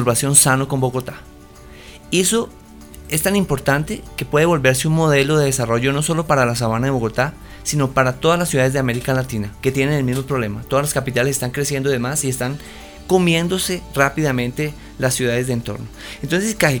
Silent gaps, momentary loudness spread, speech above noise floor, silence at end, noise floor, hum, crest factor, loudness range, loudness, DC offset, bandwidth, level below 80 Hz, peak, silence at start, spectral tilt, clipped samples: none; 11 LU; 22 dB; 0 s; -40 dBFS; none; 18 dB; 4 LU; -18 LUFS; under 0.1%; over 20 kHz; -40 dBFS; 0 dBFS; 0 s; -4.5 dB/octave; under 0.1%